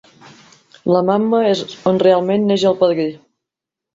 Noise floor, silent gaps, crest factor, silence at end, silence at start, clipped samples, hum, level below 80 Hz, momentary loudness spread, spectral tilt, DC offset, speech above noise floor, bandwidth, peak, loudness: -84 dBFS; none; 16 dB; 0.8 s; 0.85 s; under 0.1%; none; -62 dBFS; 6 LU; -6.5 dB/octave; under 0.1%; 70 dB; 7.8 kHz; -2 dBFS; -16 LUFS